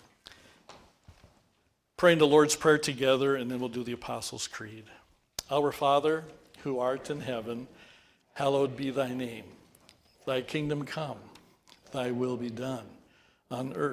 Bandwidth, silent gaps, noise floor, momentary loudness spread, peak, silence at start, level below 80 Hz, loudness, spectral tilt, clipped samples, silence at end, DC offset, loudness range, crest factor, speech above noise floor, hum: 16 kHz; none; -73 dBFS; 17 LU; -8 dBFS; 0.7 s; -66 dBFS; -29 LUFS; -4.5 dB/octave; under 0.1%; 0 s; under 0.1%; 9 LU; 22 dB; 44 dB; none